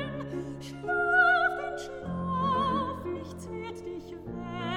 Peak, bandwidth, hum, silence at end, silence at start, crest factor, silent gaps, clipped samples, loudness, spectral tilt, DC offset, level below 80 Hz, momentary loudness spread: -12 dBFS; 14.5 kHz; none; 0 s; 0 s; 18 dB; none; under 0.1%; -29 LUFS; -6 dB/octave; under 0.1%; -54 dBFS; 17 LU